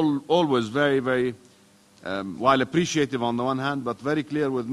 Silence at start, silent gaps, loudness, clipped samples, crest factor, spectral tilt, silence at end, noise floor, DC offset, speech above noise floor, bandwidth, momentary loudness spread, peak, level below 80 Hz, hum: 0 s; none; -24 LUFS; under 0.1%; 20 dB; -5.5 dB/octave; 0 s; -56 dBFS; under 0.1%; 32 dB; 12 kHz; 9 LU; -4 dBFS; -60 dBFS; none